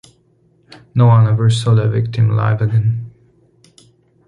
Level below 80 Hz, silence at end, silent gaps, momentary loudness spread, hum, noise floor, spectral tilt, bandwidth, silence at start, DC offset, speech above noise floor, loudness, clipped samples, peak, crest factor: -46 dBFS; 1.2 s; none; 11 LU; none; -55 dBFS; -7.5 dB/octave; 10.5 kHz; 0.95 s; under 0.1%; 43 dB; -15 LUFS; under 0.1%; -2 dBFS; 14 dB